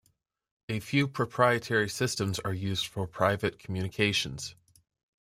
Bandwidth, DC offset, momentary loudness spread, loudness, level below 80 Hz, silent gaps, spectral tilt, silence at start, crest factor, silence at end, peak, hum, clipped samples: 16 kHz; under 0.1%; 10 LU; -29 LUFS; -60 dBFS; none; -4.5 dB/octave; 0.7 s; 22 dB; 0.7 s; -8 dBFS; none; under 0.1%